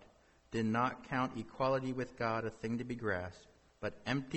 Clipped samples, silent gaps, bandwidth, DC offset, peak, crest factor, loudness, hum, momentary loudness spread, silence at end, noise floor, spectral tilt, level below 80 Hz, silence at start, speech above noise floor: under 0.1%; none; 8.4 kHz; under 0.1%; -20 dBFS; 18 dB; -38 LUFS; none; 8 LU; 0 s; -65 dBFS; -6.5 dB/octave; -64 dBFS; 0 s; 28 dB